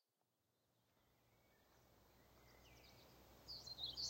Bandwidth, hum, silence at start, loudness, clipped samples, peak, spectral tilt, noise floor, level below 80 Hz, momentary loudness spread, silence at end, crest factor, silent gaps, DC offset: 16 kHz; none; 0.95 s; -54 LUFS; under 0.1%; -34 dBFS; -1.5 dB/octave; -89 dBFS; -76 dBFS; 19 LU; 0 s; 24 dB; none; under 0.1%